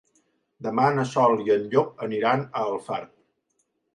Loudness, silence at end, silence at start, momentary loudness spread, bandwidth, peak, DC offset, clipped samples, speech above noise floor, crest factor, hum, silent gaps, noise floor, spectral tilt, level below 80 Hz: -24 LUFS; 0.9 s; 0.6 s; 11 LU; 10.5 kHz; -6 dBFS; under 0.1%; under 0.1%; 50 dB; 20 dB; none; none; -73 dBFS; -6.5 dB/octave; -70 dBFS